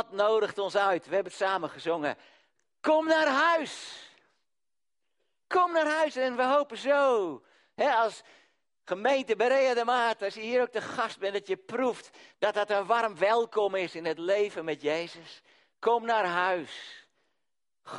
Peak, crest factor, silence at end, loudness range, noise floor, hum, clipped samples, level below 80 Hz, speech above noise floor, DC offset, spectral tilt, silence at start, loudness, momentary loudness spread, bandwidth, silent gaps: -10 dBFS; 18 dB; 0 s; 2 LU; under -90 dBFS; none; under 0.1%; -80 dBFS; over 62 dB; under 0.1%; -3.5 dB/octave; 0 s; -28 LUFS; 11 LU; 11.5 kHz; none